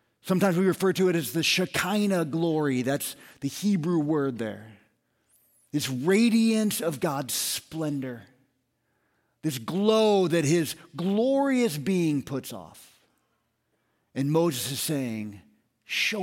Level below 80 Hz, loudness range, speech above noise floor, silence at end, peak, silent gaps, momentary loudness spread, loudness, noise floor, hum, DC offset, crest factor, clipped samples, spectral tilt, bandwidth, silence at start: -68 dBFS; 6 LU; 49 dB; 0 s; -8 dBFS; none; 13 LU; -26 LUFS; -74 dBFS; none; under 0.1%; 18 dB; under 0.1%; -5 dB/octave; 17 kHz; 0.25 s